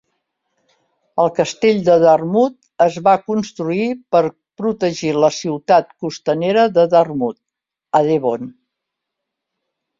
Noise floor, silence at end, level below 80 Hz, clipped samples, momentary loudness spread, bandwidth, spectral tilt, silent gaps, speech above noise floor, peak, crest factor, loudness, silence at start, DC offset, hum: -82 dBFS; 1.5 s; -60 dBFS; under 0.1%; 11 LU; 7.6 kHz; -6 dB/octave; none; 67 dB; -2 dBFS; 16 dB; -16 LUFS; 1.15 s; under 0.1%; none